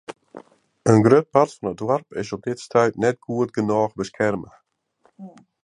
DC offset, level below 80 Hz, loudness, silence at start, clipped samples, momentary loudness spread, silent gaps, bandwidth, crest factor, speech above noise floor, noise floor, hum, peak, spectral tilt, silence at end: under 0.1%; -58 dBFS; -21 LUFS; 0.1 s; under 0.1%; 13 LU; none; 11 kHz; 20 dB; 43 dB; -63 dBFS; none; -2 dBFS; -7 dB/octave; 0.35 s